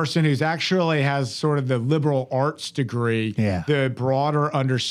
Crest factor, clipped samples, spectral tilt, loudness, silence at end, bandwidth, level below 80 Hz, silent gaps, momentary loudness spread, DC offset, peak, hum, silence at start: 14 dB; under 0.1%; -6 dB/octave; -22 LUFS; 0 s; 11.5 kHz; -60 dBFS; none; 4 LU; under 0.1%; -8 dBFS; none; 0 s